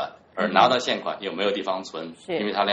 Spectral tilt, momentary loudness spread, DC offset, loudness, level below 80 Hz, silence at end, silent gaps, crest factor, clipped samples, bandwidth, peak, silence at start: -4 dB/octave; 14 LU; under 0.1%; -24 LUFS; -68 dBFS; 0 s; none; 22 dB; under 0.1%; 9.4 kHz; -2 dBFS; 0 s